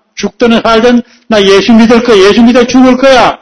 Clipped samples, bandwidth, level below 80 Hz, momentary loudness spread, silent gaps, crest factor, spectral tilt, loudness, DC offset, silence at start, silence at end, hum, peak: 8%; 11 kHz; -34 dBFS; 7 LU; none; 4 dB; -4.5 dB/octave; -5 LUFS; under 0.1%; 0.15 s; 0.05 s; none; 0 dBFS